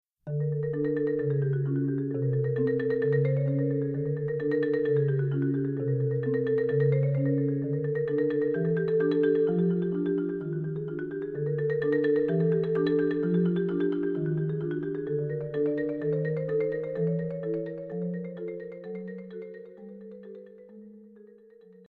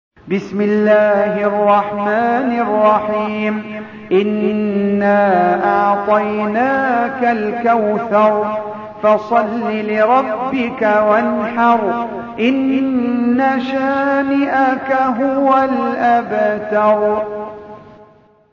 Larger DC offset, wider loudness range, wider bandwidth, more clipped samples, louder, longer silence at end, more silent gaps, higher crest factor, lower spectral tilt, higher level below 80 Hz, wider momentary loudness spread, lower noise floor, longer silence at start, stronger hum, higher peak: neither; first, 8 LU vs 1 LU; second, 4.3 kHz vs 7 kHz; neither; second, -28 LUFS vs -15 LUFS; first, 0.75 s vs 0.5 s; neither; about the same, 14 dB vs 14 dB; first, -11.5 dB/octave vs -7.5 dB/octave; second, -66 dBFS vs -56 dBFS; first, 12 LU vs 7 LU; first, -54 dBFS vs -47 dBFS; about the same, 0.25 s vs 0.25 s; neither; second, -14 dBFS vs 0 dBFS